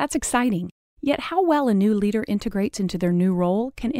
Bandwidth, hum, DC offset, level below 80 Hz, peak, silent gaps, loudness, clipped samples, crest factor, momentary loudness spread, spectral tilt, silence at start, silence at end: 16 kHz; none; under 0.1%; -46 dBFS; -8 dBFS; 0.71-0.96 s; -22 LUFS; under 0.1%; 14 dB; 6 LU; -6 dB/octave; 0 s; 0 s